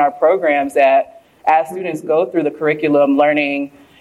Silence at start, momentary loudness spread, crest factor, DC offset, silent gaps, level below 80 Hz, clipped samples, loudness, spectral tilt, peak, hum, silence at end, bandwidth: 0 s; 10 LU; 14 dB; under 0.1%; none; -64 dBFS; under 0.1%; -15 LUFS; -6 dB/octave; -2 dBFS; none; 0.3 s; 12.5 kHz